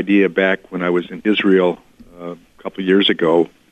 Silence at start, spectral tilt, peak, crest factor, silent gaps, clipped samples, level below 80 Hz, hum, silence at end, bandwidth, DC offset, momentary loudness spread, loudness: 0 s; -7 dB/octave; -2 dBFS; 14 dB; none; under 0.1%; -58 dBFS; none; 0.25 s; 8.4 kHz; under 0.1%; 18 LU; -16 LUFS